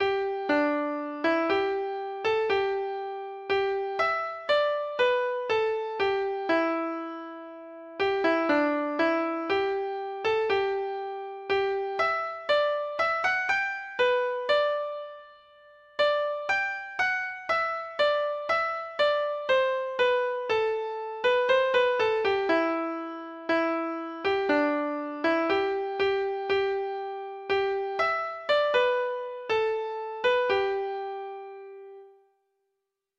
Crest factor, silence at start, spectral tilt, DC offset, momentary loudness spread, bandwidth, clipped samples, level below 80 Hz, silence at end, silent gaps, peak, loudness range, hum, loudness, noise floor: 16 dB; 0 s; -4 dB/octave; under 0.1%; 10 LU; 7.8 kHz; under 0.1%; -66 dBFS; 1.1 s; none; -12 dBFS; 2 LU; none; -27 LUFS; -82 dBFS